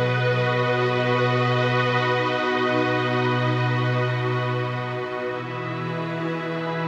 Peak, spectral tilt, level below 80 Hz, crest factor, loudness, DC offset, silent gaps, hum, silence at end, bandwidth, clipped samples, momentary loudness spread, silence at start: -8 dBFS; -7 dB/octave; -64 dBFS; 14 dB; -23 LUFS; under 0.1%; none; none; 0 s; 7.8 kHz; under 0.1%; 7 LU; 0 s